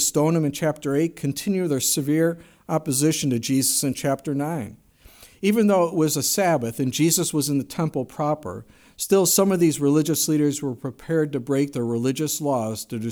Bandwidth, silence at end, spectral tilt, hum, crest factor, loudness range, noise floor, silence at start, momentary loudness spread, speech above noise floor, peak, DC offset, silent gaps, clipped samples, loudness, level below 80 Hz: over 20 kHz; 0 s; -4.5 dB/octave; none; 16 dB; 2 LU; -50 dBFS; 0 s; 9 LU; 28 dB; -6 dBFS; under 0.1%; none; under 0.1%; -22 LUFS; -60 dBFS